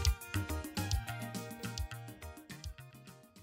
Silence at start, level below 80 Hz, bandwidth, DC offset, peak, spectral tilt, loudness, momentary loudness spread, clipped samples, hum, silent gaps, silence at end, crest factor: 0 s; -44 dBFS; 16 kHz; under 0.1%; -18 dBFS; -4 dB/octave; -41 LUFS; 16 LU; under 0.1%; none; none; 0 s; 20 dB